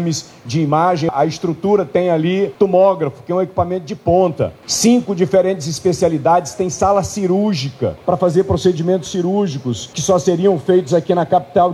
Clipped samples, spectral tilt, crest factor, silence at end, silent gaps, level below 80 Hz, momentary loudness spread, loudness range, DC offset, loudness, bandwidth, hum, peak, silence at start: under 0.1%; -5.5 dB/octave; 14 dB; 0 s; none; -46 dBFS; 7 LU; 1 LU; under 0.1%; -16 LUFS; 13.5 kHz; none; -2 dBFS; 0 s